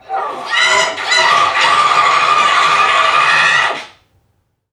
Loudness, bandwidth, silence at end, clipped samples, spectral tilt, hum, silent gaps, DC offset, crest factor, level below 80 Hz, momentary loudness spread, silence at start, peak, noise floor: -11 LUFS; 12.5 kHz; 0.85 s; under 0.1%; 0 dB/octave; none; none; under 0.1%; 12 dB; -60 dBFS; 7 LU; 0.1 s; 0 dBFS; -62 dBFS